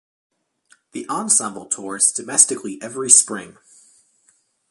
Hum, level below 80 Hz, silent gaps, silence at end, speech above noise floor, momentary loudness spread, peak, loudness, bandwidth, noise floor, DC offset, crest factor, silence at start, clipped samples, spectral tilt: none; -72 dBFS; none; 1.2 s; 42 dB; 18 LU; 0 dBFS; -16 LUFS; 16 kHz; -62 dBFS; under 0.1%; 22 dB; 0.95 s; under 0.1%; -1 dB/octave